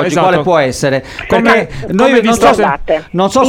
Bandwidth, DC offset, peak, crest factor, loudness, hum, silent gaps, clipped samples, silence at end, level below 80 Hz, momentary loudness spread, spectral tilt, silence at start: 16.5 kHz; under 0.1%; 0 dBFS; 10 dB; -11 LUFS; none; none; under 0.1%; 0 s; -34 dBFS; 7 LU; -5 dB/octave; 0 s